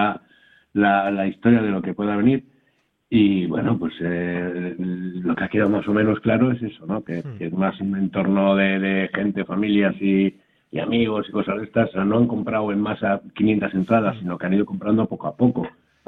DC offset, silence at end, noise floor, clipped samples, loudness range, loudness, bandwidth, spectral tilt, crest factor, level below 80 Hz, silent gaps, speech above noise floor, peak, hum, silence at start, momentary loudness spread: under 0.1%; 0.35 s; -66 dBFS; under 0.1%; 2 LU; -21 LUFS; 4.1 kHz; -10 dB/octave; 18 dB; -54 dBFS; none; 46 dB; -4 dBFS; none; 0 s; 9 LU